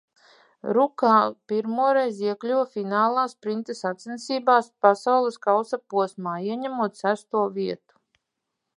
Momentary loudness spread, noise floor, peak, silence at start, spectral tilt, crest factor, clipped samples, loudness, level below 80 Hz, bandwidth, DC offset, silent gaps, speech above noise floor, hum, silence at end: 11 LU; -82 dBFS; -2 dBFS; 0.65 s; -5.5 dB/octave; 22 dB; under 0.1%; -24 LUFS; -80 dBFS; 11 kHz; under 0.1%; none; 58 dB; none; 1 s